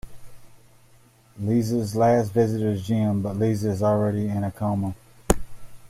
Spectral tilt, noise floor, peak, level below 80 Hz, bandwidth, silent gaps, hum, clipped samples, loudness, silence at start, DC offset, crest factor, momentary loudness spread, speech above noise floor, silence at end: -7 dB/octave; -55 dBFS; -2 dBFS; -42 dBFS; 15.5 kHz; none; none; under 0.1%; -24 LUFS; 0.05 s; under 0.1%; 24 dB; 7 LU; 32 dB; 0 s